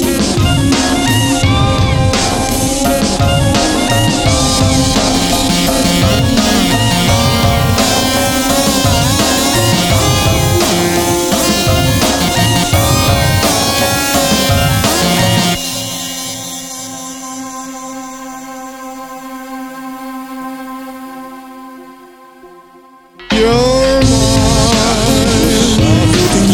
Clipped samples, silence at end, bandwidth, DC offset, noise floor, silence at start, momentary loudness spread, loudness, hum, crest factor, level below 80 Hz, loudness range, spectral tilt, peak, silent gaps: under 0.1%; 0 s; 19.5 kHz; under 0.1%; -41 dBFS; 0 s; 16 LU; -11 LUFS; none; 12 dB; -24 dBFS; 15 LU; -4 dB/octave; 0 dBFS; none